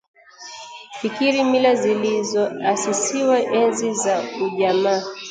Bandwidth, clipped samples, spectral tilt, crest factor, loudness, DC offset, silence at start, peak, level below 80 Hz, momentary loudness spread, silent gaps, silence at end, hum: 9.6 kHz; under 0.1%; -3.5 dB/octave; 16 dB; -20 LUFS; under 0.1%; 0.4 s; -4 dBFS; -70 dBFS; 18 LU; none; 0 s; none